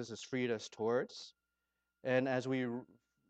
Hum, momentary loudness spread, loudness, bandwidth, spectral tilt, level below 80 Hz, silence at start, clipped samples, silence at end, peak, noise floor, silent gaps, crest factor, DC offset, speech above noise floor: none; 13 LU; -38 LUFS; 8.6 kHz; -5.5 dB/octave; -84 dBFS; 0 s; under 0.1%; 0.45 s; -20 dBFS; -87 dBFS; none; 20 dB; under 0.1%; 50 dB